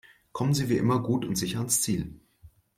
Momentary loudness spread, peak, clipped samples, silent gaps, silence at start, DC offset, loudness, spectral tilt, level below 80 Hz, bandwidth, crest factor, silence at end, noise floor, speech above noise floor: 7 LU; -10 dBFS; under 0.1%; none; 0.35 s; under 0.1%; -27 LUFS; -5 dB/octave; -54 dBFS; 16.5 kHz; 18 dB; 0.3 s; -56 dBFS; 30 dB